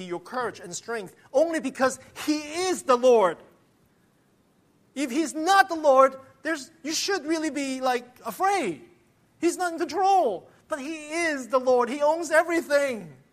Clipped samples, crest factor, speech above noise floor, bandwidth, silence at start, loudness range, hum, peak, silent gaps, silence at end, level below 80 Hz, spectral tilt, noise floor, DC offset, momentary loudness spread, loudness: under 0.1%; 22 dB; 39 dB; 15 kHz; 0 s; 3 LU; none; -4 dBFS; none; 0.2 s; -70 dBFS; -3 dB/octave; -64 dBFS; under 0.1%; 14 LU; -25 LUFS